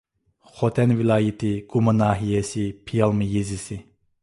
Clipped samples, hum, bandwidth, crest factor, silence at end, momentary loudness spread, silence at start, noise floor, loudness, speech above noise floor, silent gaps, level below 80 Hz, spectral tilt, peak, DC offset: under 0.1%; none; 11.5 kHz; 18 dB; 0.4 s; 10 LU; 0.55 s; -58 dBFS; -22 LUFS; 36 dB; none; -48 dBFS; -7 dB/octave; -4 dBFS; under 0.1%